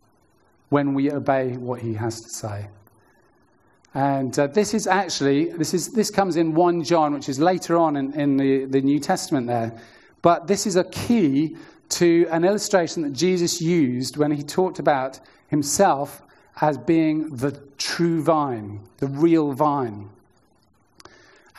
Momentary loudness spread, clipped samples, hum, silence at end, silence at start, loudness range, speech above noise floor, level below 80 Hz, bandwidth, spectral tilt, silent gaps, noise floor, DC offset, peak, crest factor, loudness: 10 LU; under 0.1%; none; 1.5 s; 0.7 s; 5 LU; 41 dB; -62 dBFS; 13 kHz; -5 dB/octave; none; -62 dBFS; under 0.1%; -2 dBFS; 20 dB; -22 LUFS